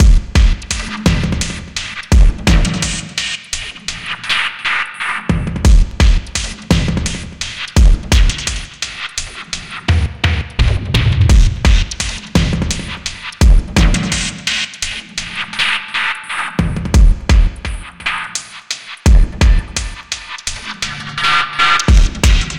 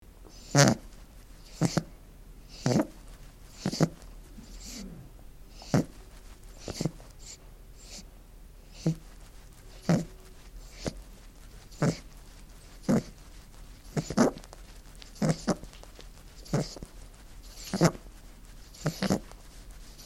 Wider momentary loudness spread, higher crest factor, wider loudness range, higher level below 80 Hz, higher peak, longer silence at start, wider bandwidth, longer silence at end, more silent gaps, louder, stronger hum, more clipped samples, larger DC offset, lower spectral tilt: second, 11 LU vs 25 LU; second, 14 dB vs 32 dB; second, 2 LU vs 5 LU; first, -16 dBFS vs -48 dBFS; about the same, 0 dBFS vs -2 dBFS; second, 0 s vs 0.2 s; second, 12 kHz vs 16.5 kHz; about the same, 0 s vs 0 s; neither; first, -16 LUFS vs -30 LUFS; neither; neither; neither; about the same, -4 dB/octave vs -5 dB/octave